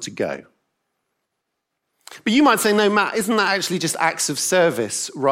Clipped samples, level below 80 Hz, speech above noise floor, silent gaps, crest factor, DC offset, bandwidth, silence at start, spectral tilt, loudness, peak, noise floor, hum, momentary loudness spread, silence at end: under 0.1%; -68 dBFS; 59 dB; none; 18 dB; under 0.1%; 16.5 kHz; 0 s; -3 dB/octave; -19 LUFS; -2 dBFS; -78 dBFS; none; 11 LU; 0 s